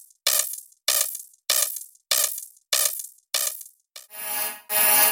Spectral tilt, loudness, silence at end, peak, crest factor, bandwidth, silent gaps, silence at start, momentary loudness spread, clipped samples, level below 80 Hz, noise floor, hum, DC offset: 2.5 dB/octave; -22 LUFS; 0 s; -4 dBFS; 22 dB; 17 kHz; none; 0.25 s; 14 LU; under 0.1%; -72 dBFS; -48 dBFS; none; under 0.1%